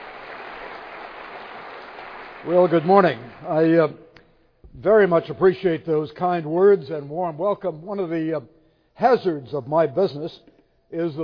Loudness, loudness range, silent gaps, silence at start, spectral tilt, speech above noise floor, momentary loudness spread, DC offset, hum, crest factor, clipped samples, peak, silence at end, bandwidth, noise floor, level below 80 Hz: -21 LUFS; 4 LU; none; 0 s; -9 dB/octave; 34 dB; 20 LU; under 0.1%; none; 20 dB; under 0.1%; -2 dBFS; 0 s; 5.4 kHz; -54 dBFS; -58 dBFS